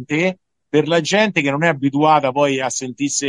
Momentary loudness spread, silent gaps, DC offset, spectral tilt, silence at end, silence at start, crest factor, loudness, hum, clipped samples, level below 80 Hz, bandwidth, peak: 6 LU; none; under 0.1%; -4 dB/octave; 0 s; 0 s; 16 dB; -17 LUFS; none; under 0.1%; -66 dBFS; 11.5 kHz; -2 dBFS